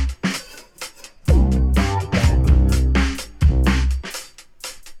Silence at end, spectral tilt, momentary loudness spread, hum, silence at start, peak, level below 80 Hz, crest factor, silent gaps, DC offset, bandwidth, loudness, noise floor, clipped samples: 0 s; -6 dB/octave; 18 LU; none; 0 s; -4 dBFS; -20 dBFS; 14 dB; none; under 0.1%; 13.5 kHz; -19 LUFS; -37 dBFS; under 0.1%